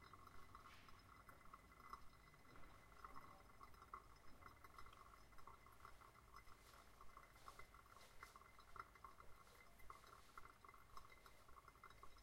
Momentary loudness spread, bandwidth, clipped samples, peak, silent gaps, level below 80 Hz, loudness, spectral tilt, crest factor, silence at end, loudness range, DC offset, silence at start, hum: 5 LU; 16 kHz; under 0.1%; -40 dBFS; none; -72 dBFS; -65 LUFS; -3.5 dB/octave; 22 dB; 0 s; 2 LU; under 0.1%; 0 s; none